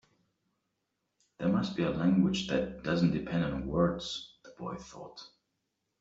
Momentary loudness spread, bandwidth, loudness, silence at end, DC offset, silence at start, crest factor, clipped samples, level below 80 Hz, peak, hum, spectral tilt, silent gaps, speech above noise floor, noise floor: 19 LU; 7.8 kHz; -31 LUFS; 0.75 s; under 0.1%; 1.4 s; 18 dB; under 0.1%; -54 dBFS; -14 dBFS; none; -6.5 dB/octave; none; 52 dB; -83 dBFS